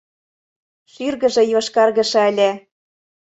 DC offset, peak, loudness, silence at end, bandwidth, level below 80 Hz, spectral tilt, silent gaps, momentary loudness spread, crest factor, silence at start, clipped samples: under 0.1%; -2 dBFS; -17 LUFS; 0.7 s; 8.2 kHz; -64 dBFS; -3.5 dB/octave; none; 10 LU; 16 dB; 1 s; under 0.1%